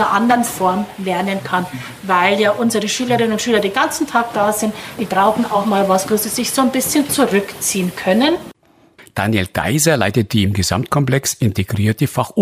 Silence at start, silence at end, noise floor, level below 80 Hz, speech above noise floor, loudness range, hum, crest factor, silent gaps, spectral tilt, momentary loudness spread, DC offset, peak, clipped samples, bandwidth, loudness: 0 s; 0 s; -48 dBFS; -48 dBFS; 32 dB; 1 LU; none; 16 dB; none; -4.5 dB/octave; 6 LU; under 0.1%; -2 dBFS; under 0.1%; 16 kHz; -16 LUFS